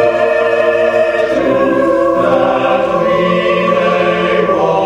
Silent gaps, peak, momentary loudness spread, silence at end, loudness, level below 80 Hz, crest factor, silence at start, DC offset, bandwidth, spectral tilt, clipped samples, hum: none; 0 dBFS; 1 LU; 0 s; -12 LUFS; -44 dBFS; 12 dB; 0 s; under 0.1%; 10 kHz; -6.5 dB/octave; under 0.1%; none